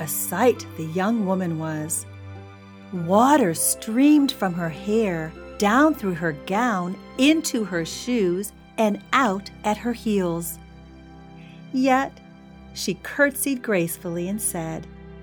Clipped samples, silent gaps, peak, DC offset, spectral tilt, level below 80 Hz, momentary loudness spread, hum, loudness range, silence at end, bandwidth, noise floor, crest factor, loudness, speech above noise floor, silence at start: under 0.1%; none; -4 dBFS; under 0.1%; -4.5 dB/octave; -52 dBFS; 14 LU; none; 5 LU; 0 s; over 20 kHz; -44 dBFS; 20 dB; -23 LUFS; 22 dB; 0 s